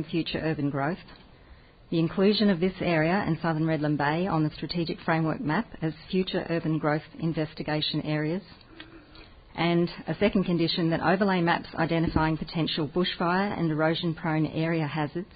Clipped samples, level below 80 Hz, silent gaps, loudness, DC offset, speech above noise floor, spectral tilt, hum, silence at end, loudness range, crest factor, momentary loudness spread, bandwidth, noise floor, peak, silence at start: under 0.1%; -50 dBFS; none; -27 LUFS; under 0.1%; 26 dB; -11 dB/octave; none; 0 s; 4 LU; 18 dB; 7 LU; 5 kHz; -52 dBFS; -10 dBFS; 0 s